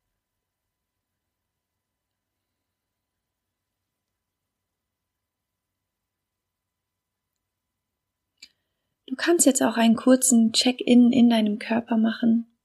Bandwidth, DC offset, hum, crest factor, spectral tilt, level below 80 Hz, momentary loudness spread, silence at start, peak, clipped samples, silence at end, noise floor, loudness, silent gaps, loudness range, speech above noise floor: 15.5 kHz; under 0.1%; none; 20 dB; -3.5 dB/octave; -76 dBFS; 7 LU; 9.1 s; -6 dBFS; under 0.1%; 0.2 s; -84 dBFS; -20 LUFS; none; 8 LU; 64 dB